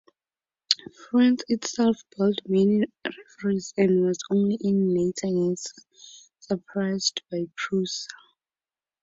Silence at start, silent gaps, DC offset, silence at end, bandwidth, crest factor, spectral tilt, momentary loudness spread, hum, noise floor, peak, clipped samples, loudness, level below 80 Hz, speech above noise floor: 0.7 s; none; under 0.1%; 0.9 s; 7.8 kHz; 24 dB; -5 dB/octave; 10 LU; none; under -90 dBFS; 0 dBFS; under 0.1%; -25 LUFS; -66 dBFS; over 65 dB